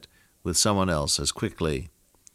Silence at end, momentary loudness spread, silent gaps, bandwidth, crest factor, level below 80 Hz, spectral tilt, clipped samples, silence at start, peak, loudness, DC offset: 0.45 s; 9 LU; none; 16 kHz; 18 dB; -44 dBFS; -3.5 dB/octave; under 0.1%; 0 s; -10 dBFS; -25 LUFS; under 0.1%